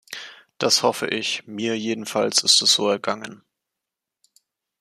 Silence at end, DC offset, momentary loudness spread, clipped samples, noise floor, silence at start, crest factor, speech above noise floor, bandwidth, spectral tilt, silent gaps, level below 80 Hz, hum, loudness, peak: 1.45 s; under 0.1%; 20 LU; under 0.1%; -85 dBFS; 0.1 s; 22 dB; 63 dB; 15 kHz; -1.5 dB/octave; none; -72 dBFS; none; -20 LUFS; -2 dBFS